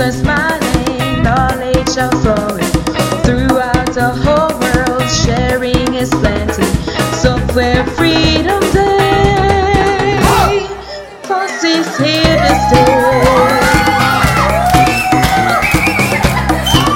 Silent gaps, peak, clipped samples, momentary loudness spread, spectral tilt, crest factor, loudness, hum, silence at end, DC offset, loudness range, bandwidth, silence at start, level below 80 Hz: none; 0 dBFS; under 0.1%; 5 LU; -5 dB/octave; 12 dB; -11 LUFS; none; 0 s; under 0.1%; 3 LU; 17 kHz; 0 s; -24 dBFS